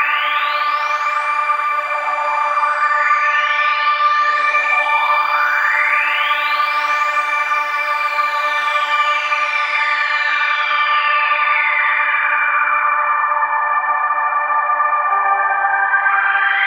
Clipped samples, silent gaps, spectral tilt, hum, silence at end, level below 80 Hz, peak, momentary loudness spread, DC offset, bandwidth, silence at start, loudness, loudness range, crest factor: under 0.1%; none; 2 dB/octave; none; 0 s; under -90 dBFS; -2 dBFS; 3 LU; under 0.1%; 16 kHz; 0 s; -15 LUFS; 2 LU; 14 dB